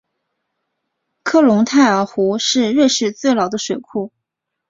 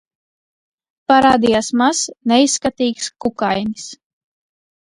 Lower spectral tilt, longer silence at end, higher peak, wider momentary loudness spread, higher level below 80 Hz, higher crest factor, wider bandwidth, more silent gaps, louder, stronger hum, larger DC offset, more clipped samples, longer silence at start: about the same, -4 dB/octave vs -3 dB/octave; second, 0.6 s vs 0.9 s; about the same, -2 dBFS vs 0 dBFS; about the same, 13 LU vs 13 LU; second, -60 dBFS vs -52 dBFS; about the same, 16 dB vs 18 dB; second, 7.8 kHz vs 11.5 kHz; neither; about the same, -15 LUFS vs -16 LUFS; neither; neither; neither; first, 1.25 s vs 1.1 s